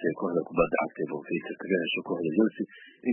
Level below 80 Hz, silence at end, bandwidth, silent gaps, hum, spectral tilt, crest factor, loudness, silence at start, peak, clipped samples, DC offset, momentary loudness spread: -58 dBFS; 0 s; 3.3 kHz; none; none; -10 dB/octave; 20 dB; -29 LUFS; 0 s; -10 dBFS; under 0.1%; under 0.1%; 8 LU